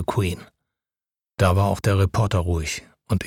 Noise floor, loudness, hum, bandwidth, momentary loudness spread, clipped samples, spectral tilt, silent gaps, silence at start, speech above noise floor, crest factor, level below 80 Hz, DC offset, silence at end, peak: under -90 dBFS; -22 LUFS; none; 15.5 kHz; 12 LU; under 0.1%; -6 dB/octave; none; 0 s; over 69 dB; 18 dB; -38 dBFS; under 0.1%; 0 s; -4 dBFS